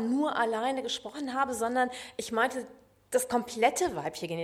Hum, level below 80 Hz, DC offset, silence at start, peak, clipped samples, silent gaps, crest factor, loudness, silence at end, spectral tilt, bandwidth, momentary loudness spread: none; -66 dBFS; under 0.1%; 0 s; -12 dBFS; under 0.1%; none; 18 dB; -30 LUFS; 0 s; -3 dB/octave; 16.5 kHz; 8 LU